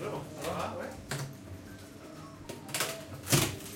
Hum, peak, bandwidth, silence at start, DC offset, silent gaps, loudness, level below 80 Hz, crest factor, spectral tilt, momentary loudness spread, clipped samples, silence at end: none; -10 dBFS; 17 kHz; 0 s; under 0.1%; none; -34 LUFS; -58 dBFS; 26 dB; -3.5 dB/octave; 19 LU; under 0.1%; 0 s